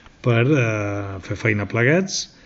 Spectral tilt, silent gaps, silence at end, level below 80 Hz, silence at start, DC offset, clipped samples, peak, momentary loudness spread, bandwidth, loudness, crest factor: -5.5 dB/octave; none; 0.2 s; -54 dBFS; 0.25 s; under 0.1%; under 0.1%; -2 dBFS; 9 LU; 8 kHz; -20 LUFS; 18 dB